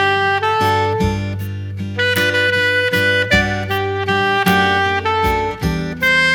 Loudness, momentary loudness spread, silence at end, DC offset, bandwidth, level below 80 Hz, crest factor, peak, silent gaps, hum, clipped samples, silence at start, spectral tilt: -16 LUFS; 7 LU; 0 s; under 0.1%; 18 kHz; -34 dBFS; 14 dB; -2 dBFS; none; none; under 0.1%; 0 s; -4.5 dB/octave